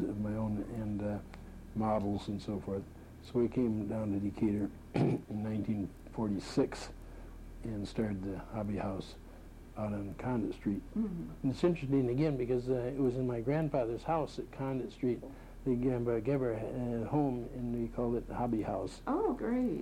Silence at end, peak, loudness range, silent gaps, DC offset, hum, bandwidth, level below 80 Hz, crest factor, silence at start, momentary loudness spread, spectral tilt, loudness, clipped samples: 0 s; -18 dBFS; 5 LU; none; under 0.1%; none; 15.5 kHz; -52 dBFS; 18 dB; 0 s; 10 LU; -8 dB/octave; -35 LUFS; under 0.1%